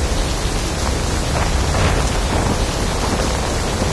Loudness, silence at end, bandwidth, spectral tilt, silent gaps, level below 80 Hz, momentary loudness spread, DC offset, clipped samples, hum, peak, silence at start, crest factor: -19 LUFS; 0 s; 11 kHz; -4.5 dB/octave; none; -22 dBFS; 3 LU; 0.2%; under 0.1%; none; -4 dBFS; 0 s; 14 dB